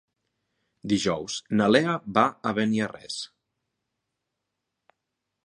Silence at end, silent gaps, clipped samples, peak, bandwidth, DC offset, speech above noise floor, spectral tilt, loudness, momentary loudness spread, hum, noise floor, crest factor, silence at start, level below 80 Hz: 2.2 s; none; under 0.1%; -4 dBFS; 11 kHz; under 0.1%; 58 dB; -5 dB/octave; -25 LUFS; 14 LU; none; -83 dBFS; 24 dB; 0.85 s; -62 dBFS